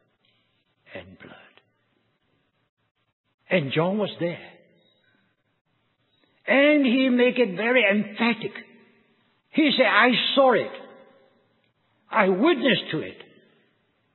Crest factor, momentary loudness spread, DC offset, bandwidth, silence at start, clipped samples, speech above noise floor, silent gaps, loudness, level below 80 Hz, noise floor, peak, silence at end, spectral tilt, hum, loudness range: 22 dB; 21 LU; under 0.1%; 4.3 kHz; 0.95 s; under 0.1%; 49 dB; 2.69-2.77 s, 2.91-2.95 s, 3.13-3.24 s, 3.34-3.38 s, 5.61-5.65 s; -21 LUFS; -74 dBFS; -70 dBFS; -2 dBFS; 1 s; -9.5 dB/octave; none; 8 LU